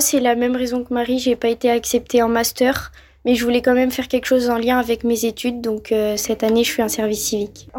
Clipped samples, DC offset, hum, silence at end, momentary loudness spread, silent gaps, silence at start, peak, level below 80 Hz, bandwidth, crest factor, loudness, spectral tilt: under 0.1%; under 0.1%; none; 0 s; 6 LU; none; 0 s; -6 dBFS; -46 dBFS; 17 kHz; 14 dB; -19 LUFS; -3 dB/octave